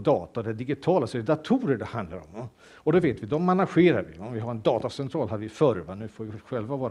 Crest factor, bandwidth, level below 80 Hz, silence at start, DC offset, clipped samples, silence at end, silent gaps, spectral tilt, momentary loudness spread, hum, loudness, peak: 18 dB; 11 kHz; -58 dBFS; 0 s; under 0.1%; under 0.1%; 0 s; none; -8 dB/octave; 15 LU; none; -26 LUFS; -8 dBFS